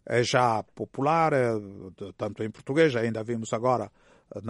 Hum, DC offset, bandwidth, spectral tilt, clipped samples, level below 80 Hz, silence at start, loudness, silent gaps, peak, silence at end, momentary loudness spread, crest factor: none; under 0.1%; 11.5 kHz; -5.5 dB/octave; under 0.1%; -64 dBFS; 0.05 s; -26 LUFS; none; -8 dBFS; 0 s; 18 LU; 18 dB